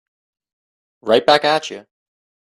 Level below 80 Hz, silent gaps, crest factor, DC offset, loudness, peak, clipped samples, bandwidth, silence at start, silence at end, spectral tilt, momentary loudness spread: -64 dBFS; none; 20 dB; under 0.1%; -15 LUFS; 0 dBFS; under 0.1%; 12.5 kHz; 1.05 s; 0.7 s; -3.5 dB/octave; 18 LU